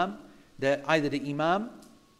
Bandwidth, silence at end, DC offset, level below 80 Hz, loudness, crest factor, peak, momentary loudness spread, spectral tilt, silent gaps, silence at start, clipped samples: 13 kHz; 0.4 s; under 0.1%; -62 dBFS; -28 LUFS; 20 dB; -8 dBFS; 11 LU; -5.5 dB/octave; none; 0 s; under 0.1%